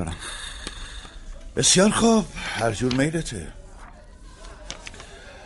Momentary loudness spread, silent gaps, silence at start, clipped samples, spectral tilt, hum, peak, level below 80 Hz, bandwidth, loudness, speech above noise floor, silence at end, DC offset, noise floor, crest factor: 25 LU; none; 0 s; under 0.1%; -3.5 dB/octave; none; -6 dBFS; -40 dBFS; 11.5 kHz; -22 LUFS; 23 dB; 0 s; under 0.1%; -44 dBFS; 20 dB